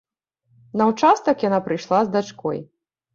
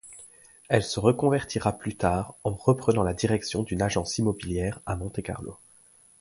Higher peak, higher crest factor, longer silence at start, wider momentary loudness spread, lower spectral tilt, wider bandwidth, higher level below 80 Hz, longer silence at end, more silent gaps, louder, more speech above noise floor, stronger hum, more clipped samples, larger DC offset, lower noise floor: about the same, -4 dBFS vs -6 dBFS; about the same, 18 dB vs 22 dB; first, 0.75 s vs 0.05 s; about the same, 11 LU vs 11 LU; about the same, -6 dB/octave vs -5.5 dB/octave; second, 7.6 kHz vs 11.5 kHz; second, -66 dBFS vs -46 dBFS; second, 0.5 s vs 0.65 s; neither; first, -20 LUFS vs -27 LUFS; first, 47 dB vs 31 dB; neither; neither; neither; first, -67 dBFS vs -57 dBFS